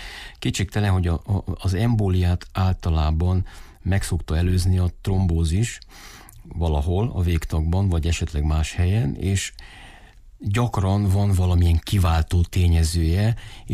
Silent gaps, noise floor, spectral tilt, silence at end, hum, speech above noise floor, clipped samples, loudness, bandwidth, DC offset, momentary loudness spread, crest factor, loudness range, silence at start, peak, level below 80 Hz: none; -46 dBFS; -6 dB/octave; 0 s; none; 25 dB; under 0.1%; -22 LUFS; 14 kHz; under 0.1%; 9 LU; 10 dB; 3 LU; 0 s; -10 dBFS; -30 dBFS